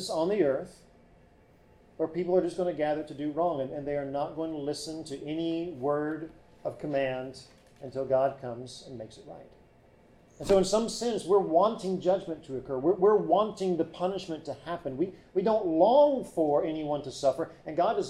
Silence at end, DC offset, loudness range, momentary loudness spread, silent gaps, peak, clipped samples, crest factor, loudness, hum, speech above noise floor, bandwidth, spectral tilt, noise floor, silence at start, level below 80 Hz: 0 s; under 0.1%; 7 LU; 16 LU; none; -12 dBFS; under 0.1%; 18 dB; -29 LUFS; none; 31 dB; 13 kHz; -5.5 dB/octave; -59 dBFS; 0 s; -60 dBFS